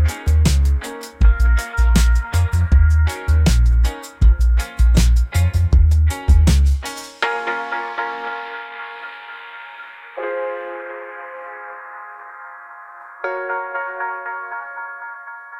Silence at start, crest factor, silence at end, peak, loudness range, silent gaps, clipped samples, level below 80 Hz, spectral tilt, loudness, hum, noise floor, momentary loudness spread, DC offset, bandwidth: 0 s; 14 dB; 0 s; -4 dBFS; 14 LU; none; under 0.1%; -18 dBFS; -5.5 dB/octave; -18 LUFS; none; -38 dBFS; 19 LU; under 0.1%; 14.5 kHz